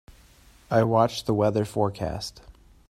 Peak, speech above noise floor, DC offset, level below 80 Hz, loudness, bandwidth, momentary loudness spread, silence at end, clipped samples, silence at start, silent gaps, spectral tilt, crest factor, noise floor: -6 dBFS; 30 dB; under 0.1%; -52 dBFS; -25 LUFS; 14.5 kHz; 10 LU; 0.4 s; under 0.1%; 0.7 s; none; -6.5 dB/octave; 20 dB; -54 dBFS